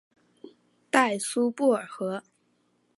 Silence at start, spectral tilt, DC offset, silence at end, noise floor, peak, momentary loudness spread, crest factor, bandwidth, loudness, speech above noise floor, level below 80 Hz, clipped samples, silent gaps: 0.45 s; -3.5 dB/octave; under 0.1%; 0.75 s; -70 dBFS; -6 dBFS; 10 LU; 24 dB; 11.5 kHz; -26 LUFS; 43 dB; -84 dBFS; under 0.1%; none